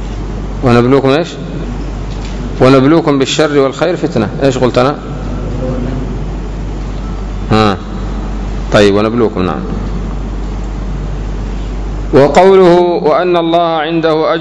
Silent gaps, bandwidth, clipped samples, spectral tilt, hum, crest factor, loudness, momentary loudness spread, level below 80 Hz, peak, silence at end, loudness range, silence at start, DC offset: none; 11 kHz; 1%; -6.5 dB/octave; none; 12 dB; -12 LUFS; 14 LU; -22 dBFS; 0 dBFS; 0 s; 7 LU; 0 s; under 0.1%